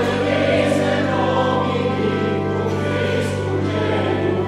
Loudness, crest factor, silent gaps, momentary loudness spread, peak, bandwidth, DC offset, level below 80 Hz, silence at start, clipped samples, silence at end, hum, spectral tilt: -19 LUFS; 14 dB; none; 4 LU; -6 dBFS; 12.5 kHz; under 0.1%; -48 dBFS; 0 s; under 0.1%; 0 s; 50 Hz at -60 dBFS; -6.5 dB/octave